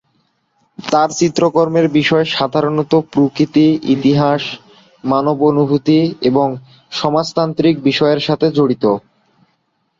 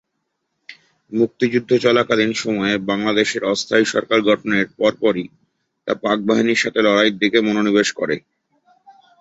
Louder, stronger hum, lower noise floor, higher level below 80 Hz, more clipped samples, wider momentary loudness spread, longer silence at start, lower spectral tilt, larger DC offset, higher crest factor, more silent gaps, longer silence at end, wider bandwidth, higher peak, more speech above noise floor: first, -14 LUFS vs -18 LUFS; neither; second, -64 dBFS vs -74 dBFS; first, -54 dBFS vs -60 dBFS; neither; about the same, 7 LU vs 8 LU; about the same, 0.8 s vs 0.7 s; first, -6 dB/octave vs -4.5 dB/octave; neither; about the same, 14 dB vs 18 dB; neither; about the same, 1 s vs 1 s; about the same, 7.6 kHz vs 8 kHz; about the same, -2 dBFS vs -2 dBFS; second, 51 dB vs 57 dB